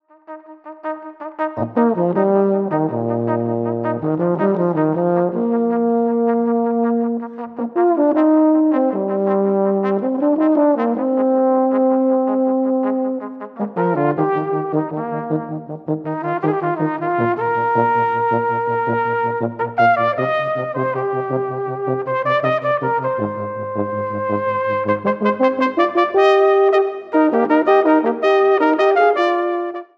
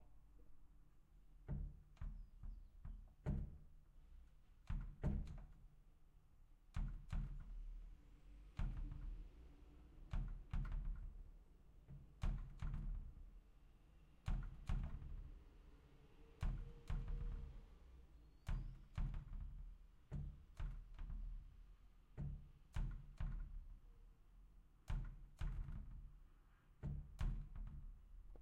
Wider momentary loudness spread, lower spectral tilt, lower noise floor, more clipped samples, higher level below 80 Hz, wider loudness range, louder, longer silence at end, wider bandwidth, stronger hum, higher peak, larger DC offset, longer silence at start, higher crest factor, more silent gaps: second, 10 LU vs 17 LU; first, -9 dB/octave vs -7.5 dB/octave; second, -38 dBFS vs -69 dBFS; neither; second, -70 dBFS vs -50 dBFS; about the same, 5 LU vs 3 LU; first, -18 LUFS vs -53 LUFS; first, 0.15 s vs 0 s; second, 6.6 kHz vs 7.6 kHz; neither; first, -2 dBFS vs -32 dBFS; neither; first, 0.3 s vs 0 s; about the same, 16 dB vs 18 dB; neither